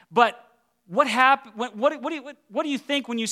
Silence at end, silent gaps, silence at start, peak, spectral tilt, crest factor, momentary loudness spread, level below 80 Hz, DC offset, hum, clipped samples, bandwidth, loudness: 0 s; none; 0.1 s; -4 dBFS; -3 dB/octave; 20 dB; 13 LU; -80 dBFS; under 0.1%; none; under 0.1%; 15 kHz; -23 LUFS